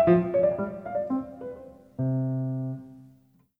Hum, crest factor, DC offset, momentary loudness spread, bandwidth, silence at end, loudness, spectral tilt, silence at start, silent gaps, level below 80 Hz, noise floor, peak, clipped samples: none; 20 dB; under 0.1%; 18 LU; 3.8 kHz; 0.55 s; -28 LUFS; -11.5 dB/octave; 0 s; none; -58 dBFS; -60 dBFS; -8 dBFS; under 0.1%